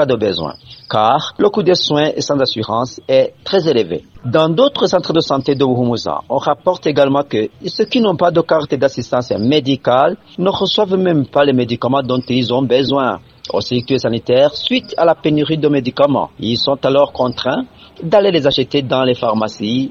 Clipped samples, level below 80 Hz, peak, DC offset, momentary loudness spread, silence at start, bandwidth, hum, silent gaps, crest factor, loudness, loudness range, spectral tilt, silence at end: under 0.1%; -50 dBFS; 0 dBFS; under 0.1%; 6 LU; 0 s; 7.4 kHz; none; none; 14 dB; -15 LUFS; 1 LU; -6 dB/octave; 0 s